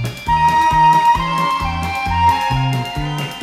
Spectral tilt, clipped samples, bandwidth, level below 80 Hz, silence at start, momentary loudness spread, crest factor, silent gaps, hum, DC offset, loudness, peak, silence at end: -5 dB/octave; under 0.1%; 15.5 kHz; -32 dBFS; 0 s; 10 LU; 12 dB; none; none; under 0.1%; -15 LUFS; -2 dBFS; 0 s